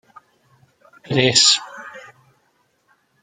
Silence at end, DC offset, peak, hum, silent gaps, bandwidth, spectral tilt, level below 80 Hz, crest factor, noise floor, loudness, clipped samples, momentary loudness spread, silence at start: 1.25 s; under 0.1%; 0 dBFS; none; none; 12 kHz; -2 dB/octave; -64 dBFS; 22 dB; -64 dBFS; -14 LUFS; under 0.1%; 24 LU; 1.1 s